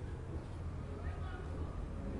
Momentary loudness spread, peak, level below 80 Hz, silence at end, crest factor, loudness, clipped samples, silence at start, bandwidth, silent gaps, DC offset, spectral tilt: 2 LU; -30 dBFS; -46 dBFS; 0 s; 12 dB; -45 LUFS; under 0.1%; 0 s; 11 kHz; none; under 0.1%; -8 dB/octave